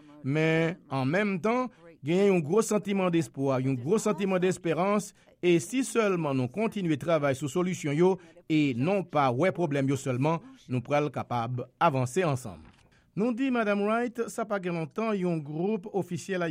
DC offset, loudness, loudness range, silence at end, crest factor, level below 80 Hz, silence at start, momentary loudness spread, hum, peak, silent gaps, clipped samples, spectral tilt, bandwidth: under 0.1%; -28 LUFS; 3 LU; 0 s; 16 dB; -68 dBFS; 0.1 s; 7 LU; none; -12 dBFS; none; under 0.1%; -6.5 dB/octave; 16 kHz